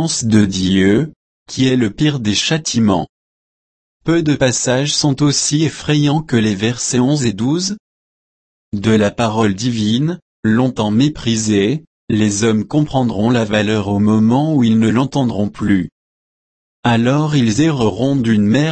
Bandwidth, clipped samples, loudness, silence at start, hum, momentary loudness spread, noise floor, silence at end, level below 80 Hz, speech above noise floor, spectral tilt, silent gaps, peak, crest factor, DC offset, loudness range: 8.8 kHz; under 0.1%; -15 LUFS; 0 s; none; 5 LU; under -90 dBFS; 0 s; -44 dBFS; over 76 dB; -5 dB/octave; 1.16-1.46 s, 3.09-4.00 s, 7.80-8.72 s, 10.22-10.43 s, 11.87-12.08 s, 15.92-16.83 s; 0 dBFS; 14 dB; under 0.1%; 3 LU